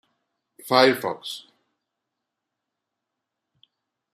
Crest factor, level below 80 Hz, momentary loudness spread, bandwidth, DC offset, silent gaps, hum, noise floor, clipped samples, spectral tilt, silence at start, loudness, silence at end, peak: 26 dB; -76 dBFS; 20 LU; 15 kHz; under 0.1%; none; none; -83 dBFS; under 0.1%; -4 dB/octave; 0.65 s; -21 LUFS; 2.75 s; -2 dBFS